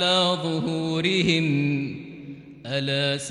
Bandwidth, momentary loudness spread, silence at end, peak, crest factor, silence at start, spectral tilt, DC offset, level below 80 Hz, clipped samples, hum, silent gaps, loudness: 12 kHz; 19 LU; 0 s; -8 dBFS; 16 dB; 0 s; -5 dB/octave; under 0.1%; -60 dBFS; under 0.1%; none; none; -23 LUFS